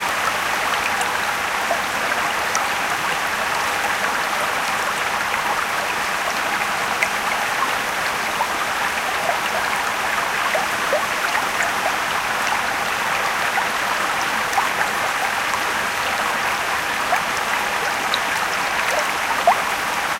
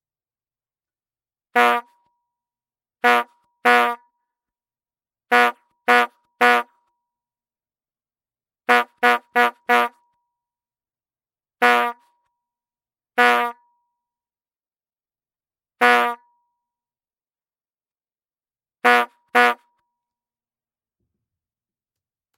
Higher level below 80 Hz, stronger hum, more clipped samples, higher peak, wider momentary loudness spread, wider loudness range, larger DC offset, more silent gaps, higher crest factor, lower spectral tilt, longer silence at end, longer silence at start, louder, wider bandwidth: first, -52 dBFS vs -90 dBFS; neither; neither; about the same, -2 dBFS vs -2 dBFS; second, 1 LU vs 10 LU; second, 1 LU vs 4 LU; neither; neither; about the same, 20 dB vs 22 dB; about the same, -1 dB/octave vs -1.5 dB/octave; second, 0 s vs 2.85 s; second, 0 s vs 1.55 s; about the same, -20 LUFS vs -18 LUFS; about the same, 17 kHz vs 16.5 kHz